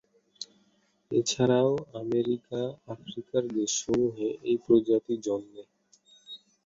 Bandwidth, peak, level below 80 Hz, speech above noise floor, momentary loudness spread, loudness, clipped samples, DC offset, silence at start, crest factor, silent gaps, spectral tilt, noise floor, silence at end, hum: 8 kHz; -10 dBFS; -66 dBFS; 41 dB; 19 LU; -28 LUFS; under 0.1%; under 0.1%; 0.4 s; 20 dB; none; -5 dB/octave; -69 dBFS; 0.3 s; none